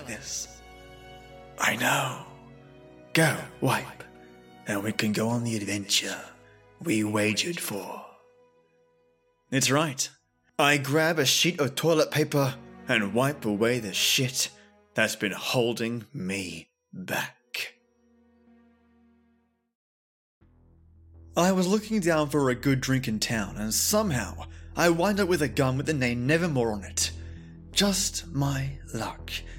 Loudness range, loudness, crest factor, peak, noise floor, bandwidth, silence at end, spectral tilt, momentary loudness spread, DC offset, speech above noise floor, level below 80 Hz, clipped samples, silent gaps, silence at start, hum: 7 LU; -26 LUFS; 22 dB; -6 dBFS; -69 dBFS; 17 kHz; 0 s; -4 dB/octave; 15 LU; under 0.1%; 42 dB; -52 dBFS; under 0.1%; 19.75-20.41 s; 0 s; none